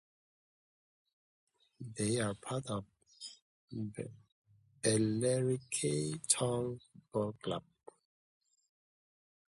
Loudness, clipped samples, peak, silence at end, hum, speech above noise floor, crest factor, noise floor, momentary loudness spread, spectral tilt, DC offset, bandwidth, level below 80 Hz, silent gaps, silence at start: -36 LUFS; under 0.1%; -14 dBFS; 1.95 s; none; over 54 dB; 24 dB; under -90 dBFS; 18 LU; -4.5 dB/octave; under 0.1%; 12 kHz; -70 dBFS; 3.42-3.68 s, 4.32-4.42 s; 1.8 s